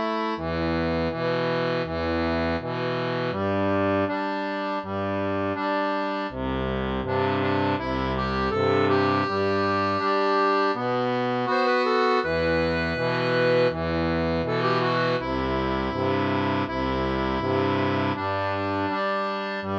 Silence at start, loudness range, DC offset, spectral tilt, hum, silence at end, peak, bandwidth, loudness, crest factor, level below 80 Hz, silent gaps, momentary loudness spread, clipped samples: 0 s; 3 LU; under 0.1%; -7 dB/octave; none; 0 s; -10 dBFS; 7.8 kHz; -25 LUFS; 14 dB; -44 dBFS; none; 6 LU; under 0.1%